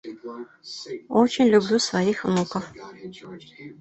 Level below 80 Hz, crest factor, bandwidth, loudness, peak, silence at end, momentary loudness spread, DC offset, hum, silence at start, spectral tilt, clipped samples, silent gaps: -62 dBFS; 20 dB; 8.4 kHz; -22 LUFS; -4 dBFS; 0.05 s; 23 LU; under 0.1%; none; 0.05 s; -5 dB/octave; under 0.1%; none